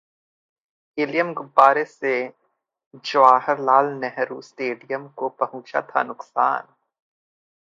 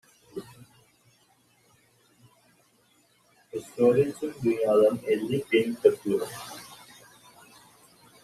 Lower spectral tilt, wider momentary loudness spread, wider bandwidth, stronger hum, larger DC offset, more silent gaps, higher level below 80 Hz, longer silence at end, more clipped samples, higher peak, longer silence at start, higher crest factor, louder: about the same, -5 dB/octave vs -6 dB/octave; second, 14 LU vs 20 LU; second, 7.6 kHz vs 14 kHz; neither; neither; first, 2.86-2.91 s vs none; second, -80 dBFS vs -68 dBFS; second, 1 s vs 1.5 s; neither; first, 0 dBFS vs -6 dBFS; first, 0.95 s vs 0.35 s; about the same, 22 dB vs 24 dB; first, -21 LUFS vs -25 LUFS